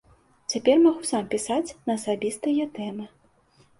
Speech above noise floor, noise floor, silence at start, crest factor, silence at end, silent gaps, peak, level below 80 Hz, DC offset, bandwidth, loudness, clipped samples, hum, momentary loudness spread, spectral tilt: 36 dB; -60 dBFS; 0.5 s; 18 dB; 0.75 s; none; -6 dBFS; -62 dBFS; under 0.1%; 11.5 kHz; -25 LUFS; under 0.1%; none; 16 LU; -4 dB/octave